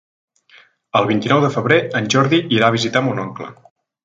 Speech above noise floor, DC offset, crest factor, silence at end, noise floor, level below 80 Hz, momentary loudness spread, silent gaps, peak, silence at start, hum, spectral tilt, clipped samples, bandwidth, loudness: 34 dB; under 0.1%; 18 dB; 0.5 s; -50 dBFS; -58 dBFS; 11 LU; none; 0 dBFS; 0.95 s; none; -5 dB/octave; under 0.1%; 9.2 kHz; -16 LUFS